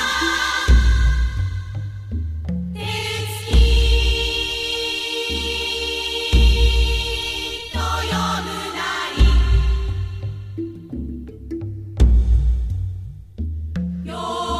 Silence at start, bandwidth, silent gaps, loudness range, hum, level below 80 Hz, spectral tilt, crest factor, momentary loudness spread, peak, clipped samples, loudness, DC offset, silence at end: 0 s; 13.5 kHz; none; 4 LU; none; -20 dBFS; -4.5 dB/octave; 16 dB; 14 LU; -2 dBFS; under 0.1%; -21 LUFS; under 0.1%; 0 s